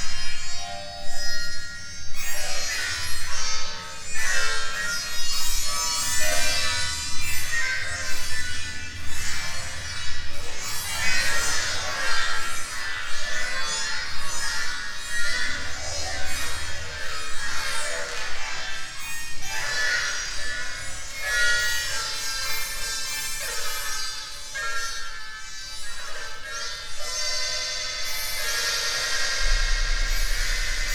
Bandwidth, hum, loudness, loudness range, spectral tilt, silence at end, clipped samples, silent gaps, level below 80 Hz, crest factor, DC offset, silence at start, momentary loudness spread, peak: 19 kHz; none; -27 LUFS; 5 LU; 0 dB/octave; 0 s; under 0.1%; none; -34 dBFS; 14 dB; under 0.1%; 0 s; 10 LU; -8 dBFS